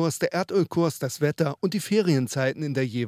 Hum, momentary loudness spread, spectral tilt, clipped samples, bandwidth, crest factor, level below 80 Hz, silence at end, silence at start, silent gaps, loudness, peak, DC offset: none; 4 LU; -6 dB/octave; under 0.1%; 16 kHz; 16 dB; -68 dBFS; 0 s; 0 s; none; -25 LUFS; -10 dBFS; under 0.1%